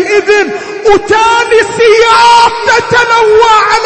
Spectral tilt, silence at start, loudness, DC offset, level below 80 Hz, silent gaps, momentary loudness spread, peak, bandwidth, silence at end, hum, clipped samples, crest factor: -2.5 dB/octave; 0 s; -6 LUFS; under 0.1%; -36 dBFS; none; 5 LU; 0 dBFS; 11 kHz; 0 s; none; 2%; 6 dB